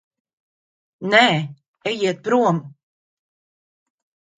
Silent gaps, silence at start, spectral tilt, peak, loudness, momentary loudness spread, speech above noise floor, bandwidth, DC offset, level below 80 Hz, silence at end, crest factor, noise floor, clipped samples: 1.68-1.74 s; 1 s; -5 dB/octave; 0 dBFS; -19 LUFS; 15 LU; over 72 dB; 9.4 kHz; under 0.1%; -70 dBFS; 1.7 s; 24 dB; under -90 dBFS; under 0.1%